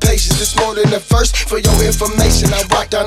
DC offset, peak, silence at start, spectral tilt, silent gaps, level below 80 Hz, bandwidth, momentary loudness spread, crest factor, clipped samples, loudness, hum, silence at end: under 0.1%; 0 dBFS; 0 s; -4 dB/octave; none; -18 dBFS; 16 kHz; 3 LU; 12 dB; under 0.1%; -13 LUFS; none; 0 s